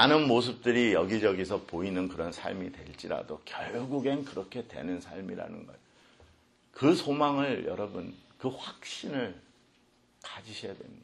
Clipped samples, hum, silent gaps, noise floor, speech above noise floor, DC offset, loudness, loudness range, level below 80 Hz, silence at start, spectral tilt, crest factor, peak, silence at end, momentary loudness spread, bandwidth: under 0.1%; none; none; -66 dBFS; 35 dB; under 0.1%; -31 LUFS; 7 LU; -64 dBFS; 0 s; -5.5 dB/octave; 24 dB; -6 dBFS; 0 s; 16 LU; 11.5 kHz